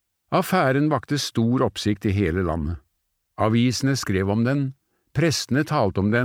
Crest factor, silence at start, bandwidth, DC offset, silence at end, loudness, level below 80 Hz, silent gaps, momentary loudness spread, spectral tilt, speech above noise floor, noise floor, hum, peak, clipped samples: 16 dB; 0.3 s; 19 kHz; under 0.1%; 0 s; -22 LUFS; -44 dBFS; none; 6 LU; -5.5 dB/octave; 53 dB; -74 dBFS; none; -6 dBFS; under 0.1%